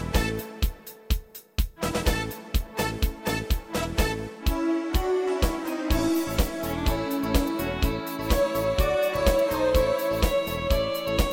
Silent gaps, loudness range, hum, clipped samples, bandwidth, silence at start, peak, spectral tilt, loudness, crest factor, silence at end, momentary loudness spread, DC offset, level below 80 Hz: none; 5 LU; none; under 0.1%; 17 kHz; 0 s; -8 dBFS; -5 dB/octave; -27 LUFS; 18 dB; 0 s; 8 LU; under 0.1%; -30 dBFS